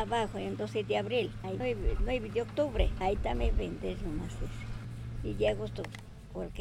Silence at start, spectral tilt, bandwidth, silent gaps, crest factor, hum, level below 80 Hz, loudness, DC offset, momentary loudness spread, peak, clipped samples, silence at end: 0 s; -6.5 dB/octave; 12 kHz; none; 20 dB; none; -38 dBFS; -34 LUFS; under 0.1%; 11 LU; -14 dBFS; under 0.1%; 0 s